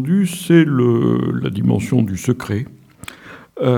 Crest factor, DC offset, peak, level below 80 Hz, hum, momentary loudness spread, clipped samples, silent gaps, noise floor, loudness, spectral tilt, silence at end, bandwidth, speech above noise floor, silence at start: 16 dB; under 0.1%; 0 dBFS; -50 dBFS; none; 22 LU; under 0.1%; none; -38 dBFS; -17 LUFS; -7 dB/octave; 0 s; 17 kHz; 22 dB; 0 s